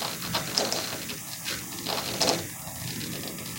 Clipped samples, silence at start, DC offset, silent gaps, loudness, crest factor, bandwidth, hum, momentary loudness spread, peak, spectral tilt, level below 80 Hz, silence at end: under 0.1%; 0 s; under 0.1%; none; -29 LUFS; 28 dB; 17 kHz; none; 9 LU; -4 dBFS; -2 dB/octave; -58 dBFS; 0 s